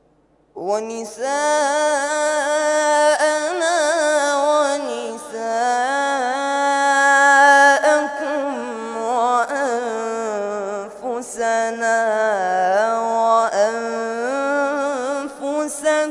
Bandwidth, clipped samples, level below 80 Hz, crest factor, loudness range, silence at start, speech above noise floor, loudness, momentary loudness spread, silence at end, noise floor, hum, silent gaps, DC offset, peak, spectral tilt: 11.5 kHz; under 0.1%; -66 dBFS; 16 dB; 6 LU; 0.55 s; 38 dB; -18 LUFS; 12 LU; 0 s; -58 dBFS; none; none; under 0.1%; -2 dBFS; -1.5 dB/octave